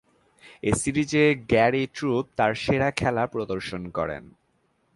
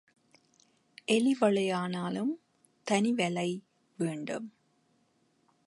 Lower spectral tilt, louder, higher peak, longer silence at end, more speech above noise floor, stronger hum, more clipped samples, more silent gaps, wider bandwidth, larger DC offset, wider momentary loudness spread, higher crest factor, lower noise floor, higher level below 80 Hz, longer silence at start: about the same, -5.5 dB/octave vs -5 dB/octave; first, -24 LUFS vs -31 LUFS; first, -6 dBFS vs -14 dBFS; second, 0.7 s vs 1.2 s; about the same, 44 dB vs 42 dB; neither; neither; neither; about the same, 11.5 kHz vs 11.5 kHz; neither; second, 10 LU vs 15 LU; about the same, 18 dB vs 18 dB; about the same, -69 dBFS vs -71 dBFS; first, -48 dBFS vs -82 dBFS; second, 0.45 s vs 1.1 s